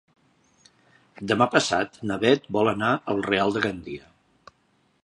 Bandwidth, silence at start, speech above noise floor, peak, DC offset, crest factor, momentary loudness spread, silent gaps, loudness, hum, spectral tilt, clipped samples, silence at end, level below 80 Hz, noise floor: 11 kHz; 1.2 s; 43 dB; -4 dBFS; under 0.1%; 22 dB; 16 LU; none; -23 LUFS; none; -4.5 dB/octave; under 0.1%; 1.05 s; -58 dBFS; -66 dBFS